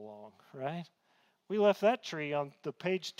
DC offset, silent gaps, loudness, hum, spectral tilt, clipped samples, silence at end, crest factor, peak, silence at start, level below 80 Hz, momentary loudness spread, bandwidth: under 0.1%; none; -33 LUFS; none; -5.5 dB/octave; under 0.1%; 0.1 s; 20 dB; -14 dBFS; 0 s; -84 dBFS; 23 LU; 15.5 kHz